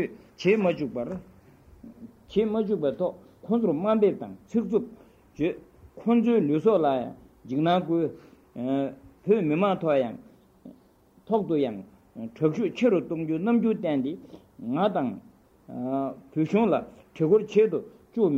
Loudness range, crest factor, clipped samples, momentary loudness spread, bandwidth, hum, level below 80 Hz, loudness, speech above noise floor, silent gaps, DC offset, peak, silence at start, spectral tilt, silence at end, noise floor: 3 LU; 18 dB; under 0.1%; 17 LU; 7.4 kHz; none; -62 dBFS; -26 LUFS; 34 dB; none; under 0.1%; -10 dBFS; 0 s; -8.5 dB/octave; 0 s; -59 dBFS